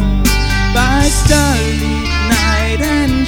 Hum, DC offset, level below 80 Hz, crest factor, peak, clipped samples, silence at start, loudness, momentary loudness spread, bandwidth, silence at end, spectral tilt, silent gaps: none; under 0.1%; -16 dBFS; 12 dB; 0 dBFS; under 0.1%; 0 s; -13 LUFS; 5 LU; over 20 kHz; 0 s; -4.5 dB/octave; none